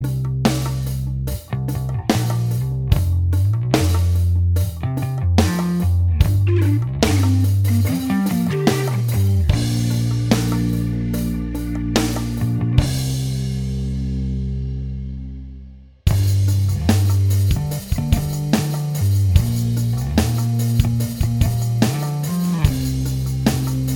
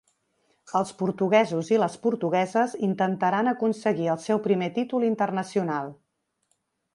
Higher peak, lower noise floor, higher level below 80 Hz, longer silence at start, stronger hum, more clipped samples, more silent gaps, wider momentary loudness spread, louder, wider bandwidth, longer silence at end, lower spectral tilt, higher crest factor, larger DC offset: first, 0 dBFS vs -6 dBFS; second, -39 dBFS vs -74 dBFS; first, -28 dBFS vs -74 dBFS; second, 0 s vs 0.7 s; neither; neither; neither; about the same, 7 LU vs 6 LU; first, -20 LUFS vs -25 LUFS; first, 19.5 kHz vs 11.5 kHz; second, 0 s vs 1 s; about the same, -6.5 dB/octave vs -6.5 dB/octave; about the same, 18 dB vs 18 dB; neither